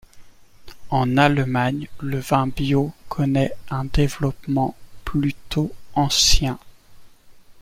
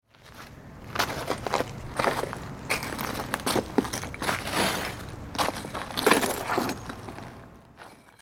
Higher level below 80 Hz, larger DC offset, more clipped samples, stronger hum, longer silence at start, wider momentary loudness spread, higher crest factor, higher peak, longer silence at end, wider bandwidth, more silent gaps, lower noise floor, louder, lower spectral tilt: first, -32 dBFS vs -50 dBFS; neither; neither; neither; about the same, 0.15 s vs 0.2 s; second, 11 LU vs 20 LU; second, 20 dB vs 28 dB; about the same, -2 dBFS vs -2 dBFS; about the same, 0 s vs 0.1 s; about the same, 16 kHz vs 17.5 kHz; neither; second, -45 dBFS vs -50 dBFS; first, -21 LUFS vs -28 LUFS; about the same, -4.5 dB/octave vs -3.5 dB/octave